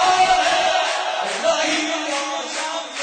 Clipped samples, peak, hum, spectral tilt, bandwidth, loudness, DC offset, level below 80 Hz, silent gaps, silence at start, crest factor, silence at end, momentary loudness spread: under 0.1%; -6 dBFS; none; -0.5 dB/octave; 9.4 kHz; -19 LUFS; under 0.1%; -56 dBFS; none; 0 s; 14 dB; 0 s; 9 LU